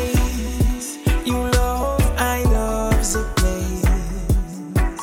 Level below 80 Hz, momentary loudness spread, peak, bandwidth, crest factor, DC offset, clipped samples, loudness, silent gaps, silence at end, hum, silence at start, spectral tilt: -22 dBFS; 4 LU; -6 dBFS; 17 kHz; 14 dB; under 0.1%; under 0.1%; -21 LUFS; none; 0 s; none; 0 s; -5 dB/octave